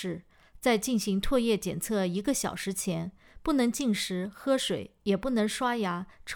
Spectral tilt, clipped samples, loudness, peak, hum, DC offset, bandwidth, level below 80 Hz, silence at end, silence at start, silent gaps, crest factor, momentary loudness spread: -4.5 dB/octave; under 0.1%; -29 LUFS; -12 dBFS; none; under 0.1%; over 20 kHz; -48 dBFS; 0 s; 0 s; none; 16 dB; 7 LU